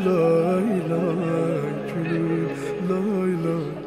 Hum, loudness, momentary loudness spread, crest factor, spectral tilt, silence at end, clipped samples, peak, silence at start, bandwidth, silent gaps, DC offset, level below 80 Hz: none; -23 LUFS; 8 LU; 14 dB; -8 dB/octave; 0 s; under 0.1%; -8 dBFS; 0 s; 14.5 kHz; none; under 0.1%; -60 dBFS